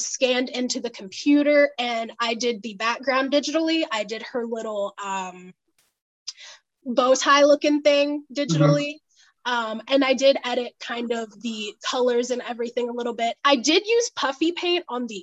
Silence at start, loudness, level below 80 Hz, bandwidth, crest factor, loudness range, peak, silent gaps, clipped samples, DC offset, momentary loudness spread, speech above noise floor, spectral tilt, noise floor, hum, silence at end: 0 s; -22 LUFS; -74 dBFS; 8.4 kHz; 18 dB; 6 LU; -4 dBFS; 6.02-6.26 s; under 0.1%; under 0.1%; 12 LU; 25 dB; -4 dB/octave; -47 dBFS; none; 0 s